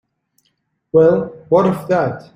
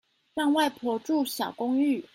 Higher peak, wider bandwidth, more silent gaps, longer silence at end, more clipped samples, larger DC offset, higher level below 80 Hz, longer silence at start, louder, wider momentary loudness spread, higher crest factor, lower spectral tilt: first, -2 dBFS vs -12 dBFS; second, 14 kHz vs 16 kHz; neither; about the same, 0.15 s vs 0.1 s; neither; neither; first, -56 dBFS vs -74 dBFS; first, 0.95 s vs 0.35 s; first, -15 LUFS vs -27 LUFS; about the same, 6 LU vs 6 LU; about the same, 16 dB vs 14 dB; first, -8.5 dB/octave vs -3.5 dB/octave